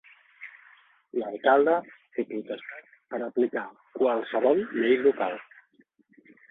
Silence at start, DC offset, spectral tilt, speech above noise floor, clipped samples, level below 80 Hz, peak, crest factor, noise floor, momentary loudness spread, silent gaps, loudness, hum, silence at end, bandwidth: 0.4 s; under 0.1%; -8 dB/octave; 38 dB; under 0.1%; -76 dBFS; -8 dBFS; 20 dB; -64 dBFS; 21 LU; none; -27 LUFS; none; 1.05 s; 4 kHz